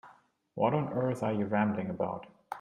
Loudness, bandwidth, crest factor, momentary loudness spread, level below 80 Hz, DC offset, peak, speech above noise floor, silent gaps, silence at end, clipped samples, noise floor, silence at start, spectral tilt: -32 LUFS; 11.5 kHz; 20 dB; 14 LU; -70 dBFS; under 0.1%; -12 dBFS; 31 dB; none; 0 s; under 0.1%; -62 dBFS; 0.05 s; -8.5 dB/octave